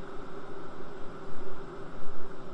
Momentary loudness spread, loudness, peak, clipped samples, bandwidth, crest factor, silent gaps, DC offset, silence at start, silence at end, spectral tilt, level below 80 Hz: 2 LU; -45 LUFS; -14 dBFS; under 0.1%; 5.8 kHz; 10 dB; none; under 0.1%; 0 s; 0 s; -7 dB/octave; -46 dBFS